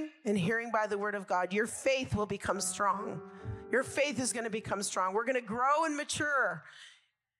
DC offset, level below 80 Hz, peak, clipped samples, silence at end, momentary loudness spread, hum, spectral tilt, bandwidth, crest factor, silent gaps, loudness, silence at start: under 0.1%; -62 dBFS; -16 dBFS; under 0.1%; 0.5 s; 6 LU; none; -3.5 dB/octave; 15.5 kHz; 16 dB; none; -32 LUFS; 0 s